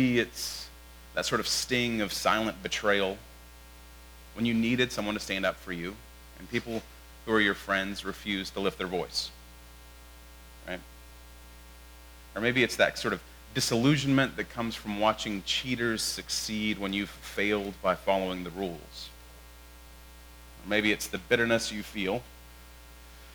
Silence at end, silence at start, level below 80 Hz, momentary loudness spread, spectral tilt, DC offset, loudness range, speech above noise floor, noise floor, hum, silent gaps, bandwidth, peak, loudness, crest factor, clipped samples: 0 s; 0 s; -52 dBFS; 25 LU; -4 dB/octave; under 0.1%; 6 LU; 21 dB; -50 dBFS; 60 Hz at -50 dBFS; none; over 20 kHz; -8 dBFS; -29 LUFS; 24 dB; under 0.1%